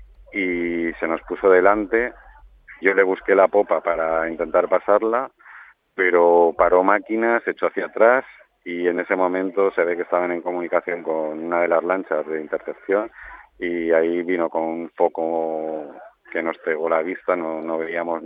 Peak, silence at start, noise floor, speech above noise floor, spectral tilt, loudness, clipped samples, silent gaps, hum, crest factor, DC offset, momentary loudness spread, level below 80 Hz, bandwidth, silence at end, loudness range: -2 dBFS; 0 s; -46 dBFS; 26 dB; -8.5 dB/octave; -21 LUFS; under 0.1%; none; none; 20 dB; under 0.1%; 11 LU; -54 dBFS; 4.7 kHz; 0 s; 5 LU